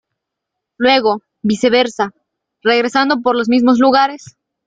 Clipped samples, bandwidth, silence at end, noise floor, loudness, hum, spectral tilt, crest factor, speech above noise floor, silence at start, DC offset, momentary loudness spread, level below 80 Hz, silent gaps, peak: under 0.1%; 9.2 kHz; 0.5 s; -79 dBFS; -14 LUFS; none; -4.5 dB/octave; 14 dB; 66 dB; 0.8 s; under 0.1%; 9 LU; -58 dBFS; none; 0 dBFS